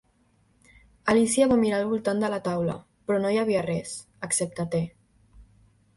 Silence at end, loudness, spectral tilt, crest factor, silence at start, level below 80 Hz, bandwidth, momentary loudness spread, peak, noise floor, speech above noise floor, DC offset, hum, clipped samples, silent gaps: 0.55 s; -26 LUFS; -5 dB/octave; 18 dB; 1.05 s; -58 dBFS; 11.5 kHz; 11 LU; -8 dBFS; -65 dBFS; 40 dB; under 0.1%; none; under 0.1%; none